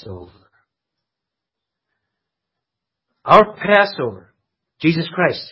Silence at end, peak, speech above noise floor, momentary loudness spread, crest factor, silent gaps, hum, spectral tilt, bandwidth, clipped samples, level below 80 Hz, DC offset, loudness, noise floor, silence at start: 0.05 s; 0 dBFS; 67 dB; 20 LU; 20 dB; none; none; -7.5 dB/octave; 8 kHz; under 0.1%; -54 dBFS; under 0.1%; -16 LUFS; -84 dBFS; 0.05 s